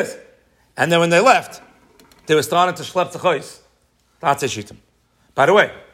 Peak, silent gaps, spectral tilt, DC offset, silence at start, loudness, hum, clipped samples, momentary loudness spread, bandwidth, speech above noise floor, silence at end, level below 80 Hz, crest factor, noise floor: 0 dBFS; none; -4 dB/octave; under 0.1%; 0 s; -17 LUFS; none; under 0.1%; 23 LU; 16 kHz; 43 dB; 0.15 s; -62 dBFS; 20 dB; -61 dBFS